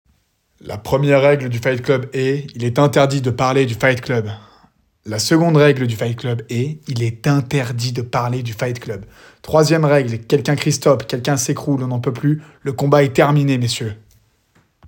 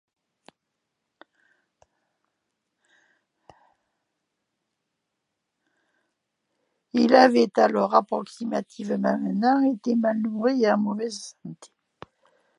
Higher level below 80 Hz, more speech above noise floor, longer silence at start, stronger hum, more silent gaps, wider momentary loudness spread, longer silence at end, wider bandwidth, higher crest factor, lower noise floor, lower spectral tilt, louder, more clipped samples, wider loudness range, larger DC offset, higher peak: first, -52 dBFS vs -78 dBFS; second, 45 dB vs 59 dB; second, 0.65 s vs 6.95 s; neither; neither; second, 10 LU vs 14 LU; second, 0.9 s vs 1.05 s; first, 18 kHz vs 11 kHz; second, 16 dB vs 24 dB; second, -62 dBFS vs -81 dBFS; about the same, -6 dB/octave vs -6 dB/octave; first, -17 LUFS vs -22 LUFS; neither; about the same, 3 LU vs 4 LU; neither; about the same, 0 dBFS vs -2 dBFS